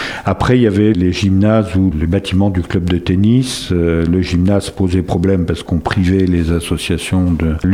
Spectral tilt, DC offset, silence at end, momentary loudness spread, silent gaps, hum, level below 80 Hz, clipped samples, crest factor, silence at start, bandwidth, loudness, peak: -7 dB/octave; under 0.1%; 0 s; 5 LU; none; none; -28 dBFS; under 0.1%; 14 dB; 0 s; 15 kHz; -14 LUFS; 0 dBFS